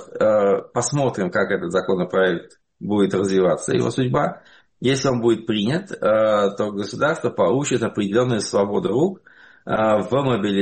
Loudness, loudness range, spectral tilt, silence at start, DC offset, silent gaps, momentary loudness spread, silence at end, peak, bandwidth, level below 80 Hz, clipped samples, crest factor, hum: -20 LUFS; 1 LU; -5.5 dB/octave; 0 s; under 0.1%; none; 5 LU; 0 s; -8 dBFS; 8.8 kHz; -56 dBFS; under 0.1%; 12 dB; none